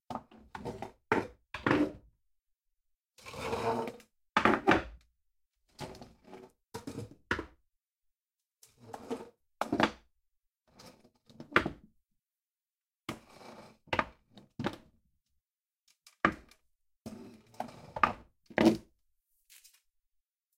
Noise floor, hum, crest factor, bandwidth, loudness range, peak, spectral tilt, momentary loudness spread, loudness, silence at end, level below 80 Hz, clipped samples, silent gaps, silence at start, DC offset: under -90 dBFS; none; 30 dB; 16 kHz; 11 LU; -6 dBFS; -5.5 dB/octave; 24 LU; -33 LUFS; 1.75 s; -60 dBFS; under 0.1%; 3.05-3.09 s; 0.1 s; under 0.1%